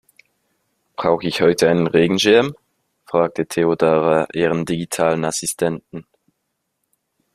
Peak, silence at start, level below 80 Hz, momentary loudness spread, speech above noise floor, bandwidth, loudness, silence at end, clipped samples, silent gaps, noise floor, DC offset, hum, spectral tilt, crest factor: 0 dBFS; 1 s; -56 dBFS; 9 LU; 57 dB; 14.5 kHz; -18 LUFS; 1.35 s; under 0.1%; none; -74 dBFS; under 0.1%; none; -4.5 dB/octave; 18 dB